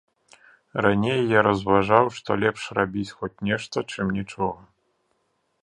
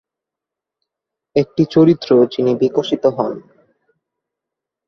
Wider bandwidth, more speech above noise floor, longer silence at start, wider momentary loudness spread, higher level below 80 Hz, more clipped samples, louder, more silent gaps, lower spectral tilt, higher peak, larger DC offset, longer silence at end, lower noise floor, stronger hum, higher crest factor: first, 11 kHz vs 6.4 kHz; second, 49 dB vs 70 dB; second, 0.75 s vs 1.35 s; about the same, 11 LU vs 10 LU; about the same, -54 dBFS vs -58 dBFS; neither; second, -23 LUFS vs -15 LUFS; neither; second, -6 dB/octave vs -8 dB/octave; about the same, -2 dBFS vs -2 dBFS; neither; second, 1.1 s vs 1.5 s; second, -72 dBFS vs -85 dBFS; neither; first, 24 dB vs 16 dB